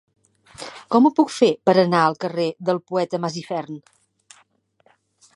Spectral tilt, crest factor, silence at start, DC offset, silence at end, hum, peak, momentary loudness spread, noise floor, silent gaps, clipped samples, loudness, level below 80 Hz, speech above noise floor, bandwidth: -6 dB/octave; 20 dB; 0.6 s; under 0.1%; 1.6 s; none; -2 dBFS; 20 LU; -61 dBFS; none; under 0.1%; -20 LUFS; -70 dBFS; 42 dB; 11.5 kHz